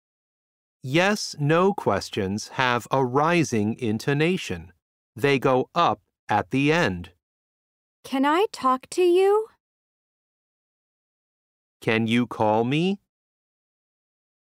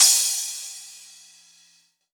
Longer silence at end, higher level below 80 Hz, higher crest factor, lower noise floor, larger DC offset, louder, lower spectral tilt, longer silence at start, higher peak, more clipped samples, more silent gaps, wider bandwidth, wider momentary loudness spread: first, 1.6 s vs 1.15 s; first, -62 dBFS vs under -90 dBFS; about the same, 20 dB vs 22 dB; first, under -90 dBFS vs -61 dBFS; neither; second, -23 LUFS vs -20 LUFS; first, -5.5 dB/octave vs 6 dB/octave; first, 0.85 s vs 0 s; about the same, -4 dBFS vs -2 dBFS; neither; first, 4.82-5.13 s, 6.19-6.27 s, 7.23-8.03 s, 9.60-11.80 s vs none; second, 16 kHz vs over 20 kHz; second, 8 LU vs 26 LU